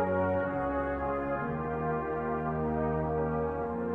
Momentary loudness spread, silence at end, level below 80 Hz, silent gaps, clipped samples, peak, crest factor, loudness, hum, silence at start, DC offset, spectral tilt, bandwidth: 3 LU; 0 s; -46 dBFS; none; under 0.1%; -18 dBFS; 14 dB; -32 LUFS; none; 0 s; under 0.1%; -10.5 dB/octave; 4.3 kHz